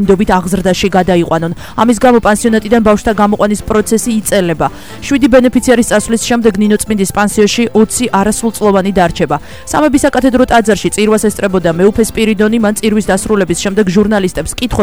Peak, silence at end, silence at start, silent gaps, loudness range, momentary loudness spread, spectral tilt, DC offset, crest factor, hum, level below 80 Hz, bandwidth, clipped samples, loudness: 0 dBFS; 0 s; 0 s; none; 1 LU; 5 LU; -5 dB/octave; 2%; 10 dB; none; -30 dBFS; over 20 kHz; 0.2%; -11 LUFS